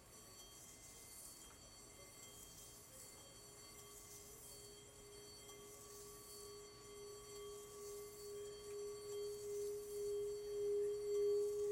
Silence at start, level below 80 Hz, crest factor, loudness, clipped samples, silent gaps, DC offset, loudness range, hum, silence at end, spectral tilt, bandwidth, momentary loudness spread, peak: 0 s; -72 dBFS; 16 dB; -49 LUFS; under 0.1%; none; under 0.1%; 11 LU; none; 0 s; -3 dB/octave; 16 kHz; 16 LU; -34 dBFS